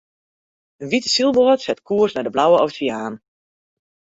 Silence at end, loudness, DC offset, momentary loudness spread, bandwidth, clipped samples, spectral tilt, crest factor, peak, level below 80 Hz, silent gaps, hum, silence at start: 1 s; -18 LUFS; under 0.1%; 11 LU; 8 kHz; under 0.1%; -4 dB/octave; 16 dB; -4 dBFS; -62 dBFS; none; none; 0.8 s